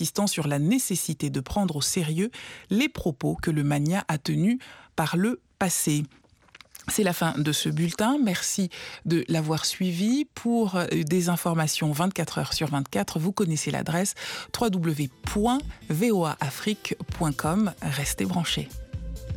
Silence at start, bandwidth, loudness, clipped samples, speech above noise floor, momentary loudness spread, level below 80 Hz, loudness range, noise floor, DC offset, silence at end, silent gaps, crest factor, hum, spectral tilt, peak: 0 s; 17.5 kHz; -26 LUFS; under 0.1%; 28 dB; 6 LU; -48 dBFS; 2 LU; -54 dBFS; under 0.1%; 0 s; none; 16 dB; none; -4.5 dB/octave; -10 dBFS